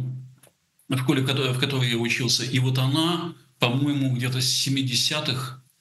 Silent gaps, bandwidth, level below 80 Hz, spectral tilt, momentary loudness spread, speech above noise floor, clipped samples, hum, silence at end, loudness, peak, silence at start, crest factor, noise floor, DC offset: none; 12.5 kHz; -68 dBFS; -4 dB/octave; 8 LU; 36 dB; under 0.1%; none; 0.2 s; -23 LUFS; -2 dBFS; 0 s; 22 dB; -59 dBFS; under 0.1%